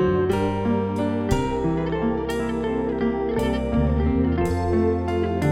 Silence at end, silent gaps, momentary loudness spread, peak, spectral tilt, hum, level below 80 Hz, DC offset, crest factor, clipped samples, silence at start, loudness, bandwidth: 0 s; none; 3 LU; -8 dBFS; -7.5 dB/octave; none; -32 dBFS; under 0.1%; 14 dB; under 0.1%; 0 s; -23 LUFS; 15.5 kHz